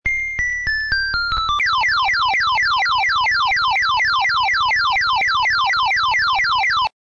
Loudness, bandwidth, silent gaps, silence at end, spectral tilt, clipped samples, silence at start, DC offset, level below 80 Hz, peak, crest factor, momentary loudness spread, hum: -16 LUFS; 7.8 kHz; none; 0.15 s; 0 dB/octave; under 0.1%; 0.05 s; under 0.1%; -40 dBFS; -6 dBFS; 10 dB; 3 LU; none